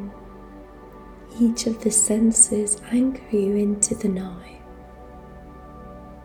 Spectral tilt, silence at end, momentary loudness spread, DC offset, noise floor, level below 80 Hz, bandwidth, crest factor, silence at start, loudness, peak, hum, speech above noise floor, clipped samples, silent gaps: -4 dB/octave; 0 s; 26 LU; under 0.1%; -42 dBFS; -46 dBFS; 19 kHz; 22 dB; 0 s; -20 LUFS; -2 dBFS; none; 21 dB; under 0.1%; none